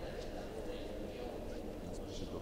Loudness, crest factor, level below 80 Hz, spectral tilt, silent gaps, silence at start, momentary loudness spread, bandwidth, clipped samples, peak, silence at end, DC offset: -46 LUFS; 12 dB; -50 dBFS; -5.5 dB/octave; none; 0 s; 1 LU; 16 kHz; under 0.1%; -32 dBFS; 0 s; under 0.1%